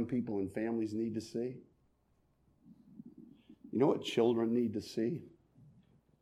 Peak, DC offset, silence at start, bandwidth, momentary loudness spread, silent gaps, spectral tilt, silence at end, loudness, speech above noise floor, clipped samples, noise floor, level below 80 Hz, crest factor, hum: -18 dBFS; under 0.1%; 0 s; 13 kHz; 23 LU; none; -6.5 dB/octave; 0.5 s; -35 LUFS; 39 dB; under 0.1%; -74 dBFS; -74 dBFS; 20 dB; none